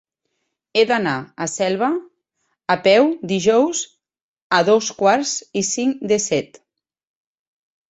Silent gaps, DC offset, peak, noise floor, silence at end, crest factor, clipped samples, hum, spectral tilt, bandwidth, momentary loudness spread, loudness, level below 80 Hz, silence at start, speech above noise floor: 4.22-4.36 s, 4.42-4.50 s; under 0.1%; -2 dBFS; -74 dBFS; 1.45 s; 18 dB; under 0.1%; none; -3.5 dB/octave; 8.2 kHz; 10 LU; -18 LUFS; -64 dBFS; 0.75 s; 57 dB